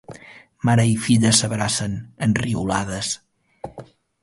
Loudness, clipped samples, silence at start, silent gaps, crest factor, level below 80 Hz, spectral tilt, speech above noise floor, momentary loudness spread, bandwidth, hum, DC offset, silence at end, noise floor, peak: -20 LUFS; under 0.1%; 0.1 s; none; 20 dB; -48 dBFS; -4.5 dB/octave; 25 dB; 21 LU; 11.5 kHz; none; under 0.1%; 0.4 s; -45 dBFS; -2 dBFS